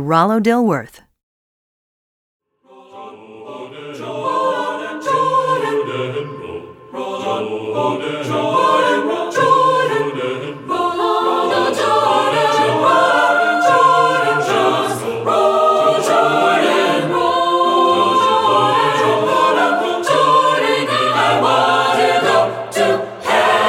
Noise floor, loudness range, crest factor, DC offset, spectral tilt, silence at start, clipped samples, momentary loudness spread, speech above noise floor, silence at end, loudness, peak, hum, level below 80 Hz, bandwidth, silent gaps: -46 dBFS; 8 LU; 14 dB; under 0.1%; -4.5 dB/octave; 0 s; under 0.1%; 10 LU; 31 dB; 0 s; -15 LUFS; 0 dBFS; none; -62 dBFS; 16 kHz; 1.23-2.40 s